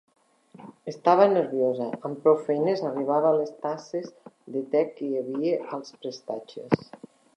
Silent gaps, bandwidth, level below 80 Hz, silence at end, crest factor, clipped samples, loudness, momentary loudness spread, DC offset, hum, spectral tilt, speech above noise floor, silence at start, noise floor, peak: none; 8.4 kHz; -72 dBFS; 0.4 s; 22 dB; under 0.1%; -26 LUFS; 15 LU; under 0.1%; none; -7 dB/octave; 25 dB; 0.6 s; -50 dBFS; -4 dBFS